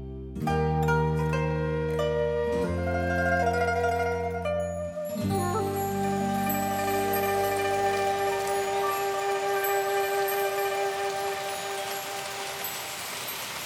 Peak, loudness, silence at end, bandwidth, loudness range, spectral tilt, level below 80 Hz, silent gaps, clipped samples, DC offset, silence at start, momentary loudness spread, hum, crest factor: -14 dBFS; -28 LUFS; 0 s; 17.5 kHz; 2 LU; -5 dB/octave; -46 dBFS; none; under 0.1%; under 0.1%; 0 s; 7 LU; none; 14 dB